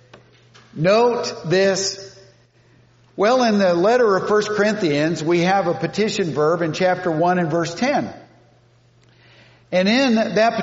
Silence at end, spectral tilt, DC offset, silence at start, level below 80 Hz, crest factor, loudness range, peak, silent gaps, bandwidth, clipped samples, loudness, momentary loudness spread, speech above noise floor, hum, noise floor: 0 s; -4 dB/octave; under 0.1%; 0.75 s; -62 dBFS; 14 dB; 4 LU; -4 dBFS; none; 8 kHz; under 0.1%; -18 LUFS; 7 LU; 37 dB; none; -54 dBFS